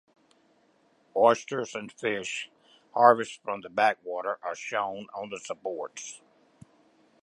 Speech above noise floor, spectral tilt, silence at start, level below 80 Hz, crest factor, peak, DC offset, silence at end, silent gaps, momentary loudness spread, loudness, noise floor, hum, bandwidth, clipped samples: 38 dB; -3.5 dB/octave; 1.15 s; -78 dBFS; 26 dB; -4 dBFS; under 0.1%; 1.05 s; none; 17 LU; -28 LUFS; -66 dBFS; none; 11.5 kHz; under 0.1%